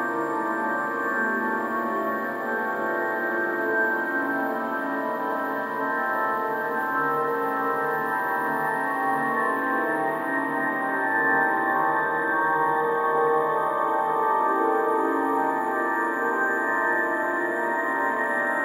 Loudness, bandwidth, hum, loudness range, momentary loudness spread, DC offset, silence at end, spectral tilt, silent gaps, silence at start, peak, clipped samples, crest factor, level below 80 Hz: -24 LUFS; 16 kHz; none; 3 LU; 4 LU; under 0.1%; 0 s; -5.5 dB/octave; none; 0 s; -10 dBFS; under 0.1%; 14 dB; -76 dBFS